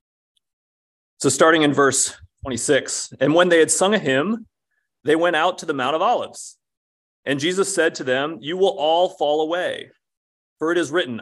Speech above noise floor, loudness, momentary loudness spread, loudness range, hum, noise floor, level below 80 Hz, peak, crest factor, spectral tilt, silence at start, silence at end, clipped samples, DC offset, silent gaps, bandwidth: 56 dB; -19 LUFS; 13 LU; 5 LU; none; -75 dBFS; -58 dBFS; -2 dBFS; 18 dB; -3 dB/octave; 1.2 s; 0 s; under 0.1%; under 0.1%; 6.77-7.23 s, 10.17-10.56 s; 13 kHz